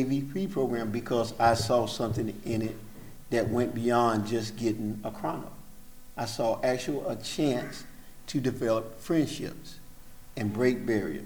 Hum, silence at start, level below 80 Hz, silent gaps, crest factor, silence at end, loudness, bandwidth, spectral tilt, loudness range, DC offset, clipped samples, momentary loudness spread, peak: none; 0 s; -52 dBFS; none; 20 dB; 0 s; -30 LUFS; over 20 kHz; -6 dB/octave; 4 LU; under 0.1%; under 0.1%; 18 LU; -10 dBFS